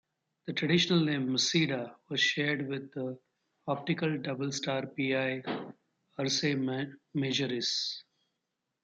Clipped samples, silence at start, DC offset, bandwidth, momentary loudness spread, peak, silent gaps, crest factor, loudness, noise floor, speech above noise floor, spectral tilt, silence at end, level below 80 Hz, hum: under 0.1%; 0.45 s; under 0.1%; 9 kHz; 12 LU; -14 dBFS; none; 18 dB; -31 LUFS; -85 dBFS; 53 dB; -4 dB/octave; 0.85 s; -76 dBFS; none